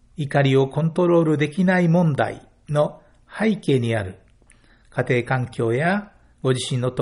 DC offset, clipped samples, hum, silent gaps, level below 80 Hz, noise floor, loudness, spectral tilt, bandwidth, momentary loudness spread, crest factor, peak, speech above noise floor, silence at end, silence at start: under 0.1%; under 0.1%; none; none; -54 dBFS; -53 dBFS; -21 LUFS; -7 dB/octave; 10.5 kHz; 9 LU; 14 dB; -6 dBFS; 34 dB; 0 s; 0.2 s